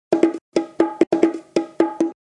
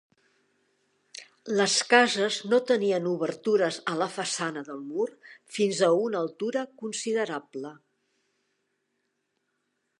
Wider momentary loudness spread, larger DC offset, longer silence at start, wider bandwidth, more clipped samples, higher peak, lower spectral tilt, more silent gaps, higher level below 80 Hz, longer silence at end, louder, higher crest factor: second, 7 LU vs 18 LU; neither; second, 0.1 s vs 1.15 s; second, 9.6 kHz vs 11.5 kHz; neither; first, 0 dBFS vs -4 dBFS; first, -6 dB/octave vs -3 dB/octave; first, 0.41-0.52 s, 1.07-1.11 s vs none; first, -68 dBFS vs -84 dBFS; second, 0.15 s vs 2.25 s; first, -21 LUFS vs -26 LUFS; about the same, 20 dB vs 24 dB